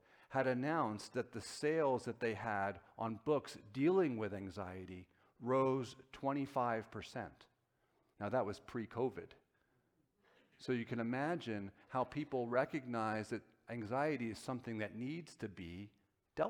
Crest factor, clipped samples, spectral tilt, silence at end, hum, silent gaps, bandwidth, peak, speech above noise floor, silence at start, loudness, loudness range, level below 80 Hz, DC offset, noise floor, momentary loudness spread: 20 dB; under 0.1%; -6.5 dB/octave; 0 s; none; none; 17 kHz; -20 dBFS; 40 dB; 0.3 s; -40 LUFS; 5 LU; -74 dBFS; under 0.1%; -80 dBFS; 13 LU